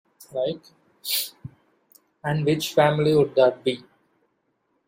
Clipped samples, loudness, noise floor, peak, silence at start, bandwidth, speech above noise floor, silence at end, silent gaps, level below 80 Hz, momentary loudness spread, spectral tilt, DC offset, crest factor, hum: under 0.1%; -23 LUFS; -72 dBFS; -6 dBFS; 0.3 s; 16 kHz; 50 dB; 1.1 s; none; -62 dBFS; 16 LU; -5 dB/octave; under 0.1%; 20 dB; none